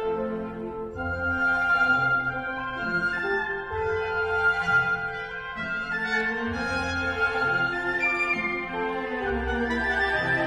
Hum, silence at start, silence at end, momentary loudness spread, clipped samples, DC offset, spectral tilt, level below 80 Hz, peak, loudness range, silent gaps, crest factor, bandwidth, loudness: none; 0 s; 0 s; 9 LU; under 0.1%; under 0.1%; -5.5 dB/octave; -46 dBFS; -12 dBFS; 1 LU; none; 14 dB; 12 kHz; -26 LUFS